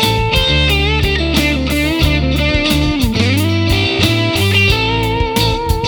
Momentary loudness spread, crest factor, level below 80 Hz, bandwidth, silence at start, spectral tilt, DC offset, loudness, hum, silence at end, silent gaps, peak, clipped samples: 3 LU; 14 dB; -20 dBFS; over 20 kHz; 0 s; -5 dB/octave; under 0.1%; -13 LUFS; none; 0 s; none; 0 dBFS; under 0.1%